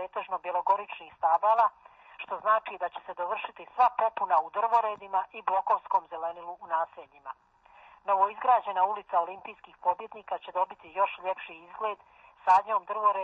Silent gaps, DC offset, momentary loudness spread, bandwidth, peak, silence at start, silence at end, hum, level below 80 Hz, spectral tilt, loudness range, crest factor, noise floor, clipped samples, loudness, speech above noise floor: none; under 0.1%; 16 LU; 7.2 kHz; -12 dBFS; 0 s; 0 s; none; -76 dBFS; 0 dB/octave; 4 LU; 18 dB; -56 dBFS; under 0.1%; -29 LUFS; 28 dB